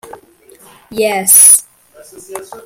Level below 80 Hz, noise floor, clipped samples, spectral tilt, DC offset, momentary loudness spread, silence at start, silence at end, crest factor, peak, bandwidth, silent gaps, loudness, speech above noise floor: -56 dBFS; -43 dBFS; 0.8%; -0.5 dB/octave; under 0.1%; 26 LU; 0.9 s; 0.05 s; 14 dB; 0 dBFS; over 20 kHz; none; -6 LUFS; 33 dB